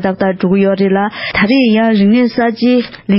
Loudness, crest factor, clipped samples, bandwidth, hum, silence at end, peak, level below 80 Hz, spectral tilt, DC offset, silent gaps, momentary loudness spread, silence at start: -12 LUFS; 10 dB; under 0.1%; 5.8 kHz; none; 0 s; -2 dBFS; -46 dBFS; -11 dB/octave; 0.1%; none; 5 LU; 0 s